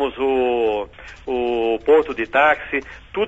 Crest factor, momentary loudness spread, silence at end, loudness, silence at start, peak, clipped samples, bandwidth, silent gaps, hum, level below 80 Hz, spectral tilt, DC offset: 16 dB; 11 LU; 0 s; -19 LUFS; 0 s; -4 dBFS; under 0.1%; 7.8 kHz; none; none; -46 dBFS; -5.5 dB/octave; under 0.1%